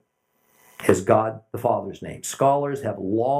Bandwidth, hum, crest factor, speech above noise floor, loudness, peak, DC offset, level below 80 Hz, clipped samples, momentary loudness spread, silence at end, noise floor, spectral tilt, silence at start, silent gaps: 15.5 kHz; none; 22 dB; 46 dB; -23 LUFS; -2 dBFS; under 0.1%; -64 dBFS; under 0.1%; 11 LU; 0 s; -69 dBFS; -6 dB/octave; 0.8 s; none